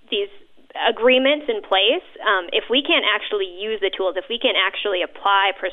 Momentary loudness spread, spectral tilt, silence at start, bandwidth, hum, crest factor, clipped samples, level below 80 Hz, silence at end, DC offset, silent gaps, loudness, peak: 9 LU; -4.5 dB/octave; 0.1 s; 4 kHz; none; 14 dB; under 0.1%; -60 dBFS; 0 s; under 0.1%; none; -19 LUFS; -6 dBFS